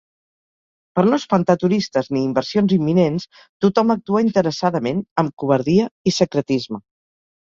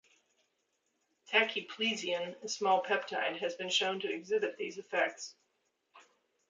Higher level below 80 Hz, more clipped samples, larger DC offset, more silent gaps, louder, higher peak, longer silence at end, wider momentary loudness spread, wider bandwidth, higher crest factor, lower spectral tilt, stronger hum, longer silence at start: first, -56 dBFS vs -90 dBFS; neither; neither; first, 3.49-3.60 s, 5.11-5.16 s, 5.33-5.37 s, 5.91-6.05 s vs none; first, -19 LUFS vs -33 LUFS; first, -2 dBFS vs -14 dBFS; first, 0.8 s vs 0.5 s; about the same, 6 LU vs 8 LU; second, 7.6 kHz vs 9.4 kHz; about the same, 18 dB vs 22 dB; first, -6.5 dB/octave vs -2 dB/octave; neither; second, 0.95 s vs 1.3 s